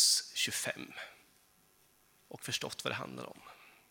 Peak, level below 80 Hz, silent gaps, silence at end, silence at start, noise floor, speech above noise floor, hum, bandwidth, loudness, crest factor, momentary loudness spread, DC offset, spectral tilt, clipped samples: -16 dBFS; -78 dBFS; none; 0.2 s; 0 s; -68 dBFS; 27 dB; none; 19 kHz; -35 LUFS; 24 dB; 23 LU; under 0.1%; -0.5 dB/octave; under 0.1%